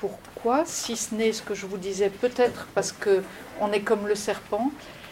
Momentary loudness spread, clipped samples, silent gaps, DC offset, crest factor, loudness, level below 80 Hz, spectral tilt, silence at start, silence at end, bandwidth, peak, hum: 8 LU; under 0.1%; none; under 0.1%; 18 dB; -27 LUFS; -58 dBFS; -3.5 dB/octave; 0 s; 0 s; 16.5 kHz; -10 dBFS; none